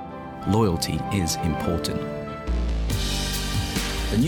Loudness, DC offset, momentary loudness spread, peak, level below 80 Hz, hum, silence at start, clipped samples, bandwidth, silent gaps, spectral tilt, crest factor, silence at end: -25 LUFS; under 0.1%; 8 LU; -10 dBFS; -32 dBFS; none; 0 s; under 0.1%; over 20 kHz; none; -5 dB/octave; 16 dB; 0 s